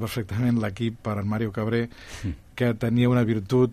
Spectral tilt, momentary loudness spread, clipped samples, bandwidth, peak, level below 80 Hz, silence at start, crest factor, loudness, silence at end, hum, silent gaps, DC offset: -7.5 dB/octave; 13 LU; under 0.1%; 14.5 kHz; -10 dBFS; -48 dBFS; 0 s; 16 dB; -26 LUFS; 0 s; none; none; under 0.1%